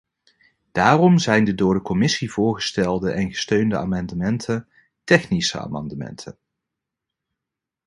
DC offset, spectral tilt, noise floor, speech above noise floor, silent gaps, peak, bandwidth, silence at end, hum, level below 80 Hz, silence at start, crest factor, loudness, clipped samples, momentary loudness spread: under 0.1%; -5.5 dB/octave; -85 dBFS; 66 dB; none; 0 dBFS; 11.5 kHz; 1.55 s; none; -48 dBFS; 0.75 s; 22 dB; -20 LUFS; under 0.1%; 15 LU